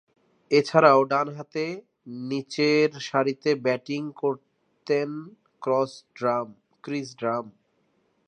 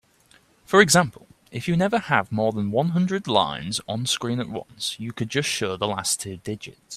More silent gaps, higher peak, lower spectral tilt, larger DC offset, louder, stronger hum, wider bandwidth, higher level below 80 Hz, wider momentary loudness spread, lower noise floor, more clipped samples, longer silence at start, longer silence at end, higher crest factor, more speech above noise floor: neither; about the same, -2 dBFS vs 0 dBFS; first, -5.5 dB/octave vs -4 dB/octave; neither; about the same, -25 LUFS vs -23 LUFS; neither; second, 9.4 kHz vs 15 kHz; second, -80 dBFS vs -60 dBFS; first, 18 LU vs 14 LU; first, -69 dBFS vs -58 dBFS; neither; second, 0.5 s vs 0.7 s; first, 0.8 s vs 0 s; about the same, 24 dB vs 24 dB; first, 45 dB vs 35 dB